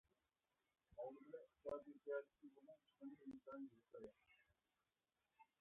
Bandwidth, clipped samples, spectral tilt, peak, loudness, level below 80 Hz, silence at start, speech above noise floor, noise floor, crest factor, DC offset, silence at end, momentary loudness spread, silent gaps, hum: 3.7 kHz; under 0.1%; -2 dB/octave; -36 dBFS; -57 LUFS; -88 dBFS; 0.9 s; over 33 dB; under -90 dBFS; 22 dB; under 0.1%; 0.15 s; 15 LU; none; none